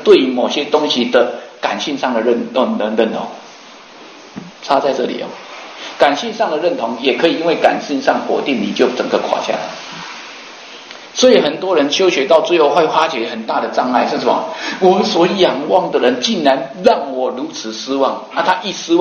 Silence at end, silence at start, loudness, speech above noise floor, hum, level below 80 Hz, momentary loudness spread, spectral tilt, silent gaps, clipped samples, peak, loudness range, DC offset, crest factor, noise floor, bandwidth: 0 s; 0 s; -15 LUFS; 23 dB; none; -62 dBFS; 16 LU; -4 dB/octave; none; 0.1%; 0 dBFS; 5 LU; under 0.1%; 16 dB; -38 dBFS; 8.8 kHz